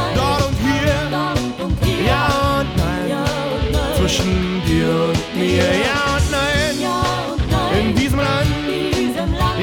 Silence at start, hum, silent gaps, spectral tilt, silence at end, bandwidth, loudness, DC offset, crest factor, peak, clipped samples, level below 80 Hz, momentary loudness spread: 0 s; none; none; -5 dB/octave; 0 s; 19.5 kHz; -18 LUFS; under 0.1%; 14 dB; -2 dBFS; under 0.1%; -26 dBFS; 4 LU